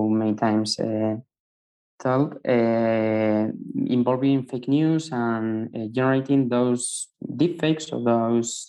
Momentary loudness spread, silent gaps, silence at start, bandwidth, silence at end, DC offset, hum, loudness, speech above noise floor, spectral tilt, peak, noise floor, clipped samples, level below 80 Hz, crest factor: 7 LU; 1.40-1.98 s; 0 s; 12 kHz; 0 s; under 0.1%; none; -23 LUFS; over 67 dB; -6 dB/octave; -8 dBFS; under -90 dBFS; under 0.1%; -68 dBFS; 14 dB